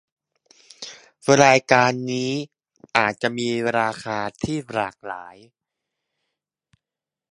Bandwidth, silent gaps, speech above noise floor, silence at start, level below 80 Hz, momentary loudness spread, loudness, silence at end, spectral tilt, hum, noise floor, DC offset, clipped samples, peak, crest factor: 11.5 kHz; none; 68 dB; 0.8 s; -58 dBFS; 22 LU; -21 LUFS; 2 s; -4 dB/octave; none; -88 dBFS; under 0.1%; under 0.1%; 0 dBFS; 24 dB